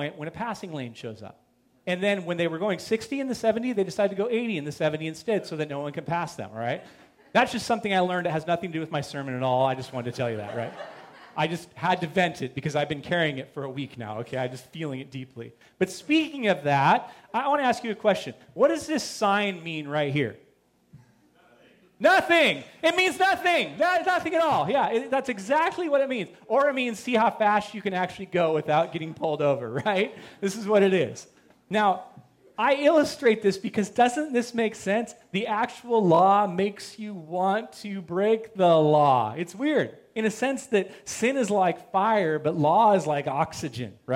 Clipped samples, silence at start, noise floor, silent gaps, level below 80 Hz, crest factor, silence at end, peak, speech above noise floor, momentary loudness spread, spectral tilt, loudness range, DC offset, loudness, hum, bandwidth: under 0.1%; 0 s; -63 dBFS; none; -68 dBFS; 18 dB; 0 s; -8 dBFS; 38 dB; 13 LU; -5 dB/octave; 6 LU; under 0.1%; -25 LUFS; none; 16.5 kHz